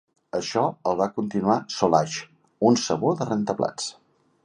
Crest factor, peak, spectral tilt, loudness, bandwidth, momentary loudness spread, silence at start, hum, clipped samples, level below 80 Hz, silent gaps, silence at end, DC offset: 20 dB; -4 dBFS; -5 dB/octave; -24 LUFS; 11 kHz; 10 LU; 0.35 s; none; under 0.1%; -62 dBFS; none; 0.5 s; under 0.1%